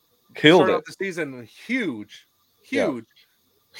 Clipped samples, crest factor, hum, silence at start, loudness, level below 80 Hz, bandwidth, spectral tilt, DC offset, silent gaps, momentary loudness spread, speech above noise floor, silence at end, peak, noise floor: under 0.1%; 22 dB; none; 0.35 s; -21 LUFS; -72 dBFS; 16.5 kHz; -5 dB/octave; under 0.1%; none; 23 LU; 43 dB; 0 s; 0 dBFS; -65 dBFS